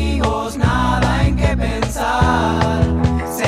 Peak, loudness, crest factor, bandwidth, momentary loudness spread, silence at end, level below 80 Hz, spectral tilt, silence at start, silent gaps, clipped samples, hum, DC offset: -2 dBFS; -17 LUFS; 14 dB; 15.5 kHz; 4 LU; 0 s; -24 dBFS; -6 dB/octave; 0 s; none; under 0.1%; none; under 0.1%